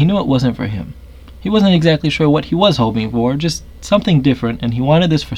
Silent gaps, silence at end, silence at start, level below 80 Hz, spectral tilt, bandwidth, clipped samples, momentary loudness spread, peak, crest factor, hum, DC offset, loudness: none; 0 s; 0 s; -36 dBFS; -6.5 dB/octave; 12 kHz; under 0.1%; 10 LU; 0 dBFS; 14 dB; none; under 0.1%; -15 LUFS